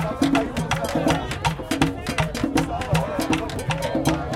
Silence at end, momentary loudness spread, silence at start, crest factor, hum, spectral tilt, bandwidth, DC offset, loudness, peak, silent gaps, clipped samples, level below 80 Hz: 0 s; 4 LU; 0 s; 18 dB; none; -5 dB/octave; 16.5 kHz; under 0.1%; -23 LUFS; -4 dBFS; none; under 0.1%; -38 dBFS